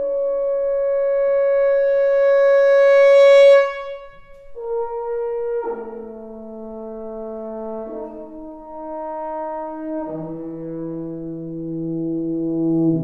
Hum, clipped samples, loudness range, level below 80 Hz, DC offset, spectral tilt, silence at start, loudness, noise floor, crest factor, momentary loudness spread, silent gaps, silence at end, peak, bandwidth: none; under 0.1%; 16 LU; -50 dBFS; 0.4%; -7 dB/octave; 0 s; -18 LUFS; -40 dBFS; 14 dB; 21 LU; none; 0 s; -4 dBFS; 7.6 kHz